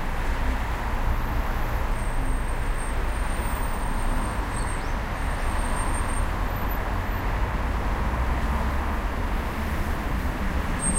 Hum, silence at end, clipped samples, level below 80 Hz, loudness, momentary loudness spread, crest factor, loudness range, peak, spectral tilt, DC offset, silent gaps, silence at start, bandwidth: none; 0 s; under 0.1%; -26 dBFS; -28 LUFS; 3 LU; 12 dB; 1 LU; -12 dBFS; -5 dB/octave; under 0.1%; none; 0 s; 16 kHz